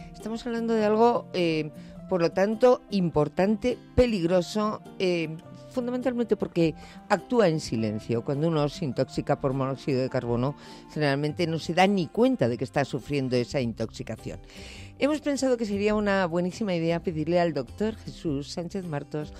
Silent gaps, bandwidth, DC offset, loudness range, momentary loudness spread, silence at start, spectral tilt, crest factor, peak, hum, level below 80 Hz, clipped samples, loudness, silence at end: none; 13 kHz; under 0.1%; 3 LU; 12 LU; 0 s; -6.5 dB/octave; 16 dB; -10 dBFS; none; -50 dBFS; under 0.1%; -27 LUFS; 0 s